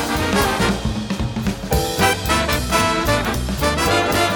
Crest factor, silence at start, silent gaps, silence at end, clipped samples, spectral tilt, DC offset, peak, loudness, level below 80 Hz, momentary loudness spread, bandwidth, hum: 18 dB; 0 s; none; 0 s; under 0.1%; -4 dB/octave; under 0.1%; -2 dBFS; -19 LUFS; -28 dBFS; 7 LU; over 20 kHz; none